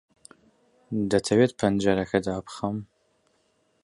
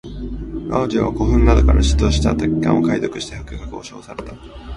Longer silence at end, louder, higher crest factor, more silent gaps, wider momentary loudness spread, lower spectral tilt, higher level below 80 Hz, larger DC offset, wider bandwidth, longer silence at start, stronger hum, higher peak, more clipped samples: first, 1 s vs 0 s; second, -25 LUFS vs -17 LUFS; about the same, 20 dB vs 18 dB; neither; second, 11 LU vs 19 LU; about the same, -6 dB/octave vs -6.5 dB/octave; second, -54 dBFS vs -20 dBFS; neither; about the same, 11.5 kHz vs 11 kHz; first, 0.9 s vs 0.05 s; neither; second, -8 dBFS vs 0 dBFS; neither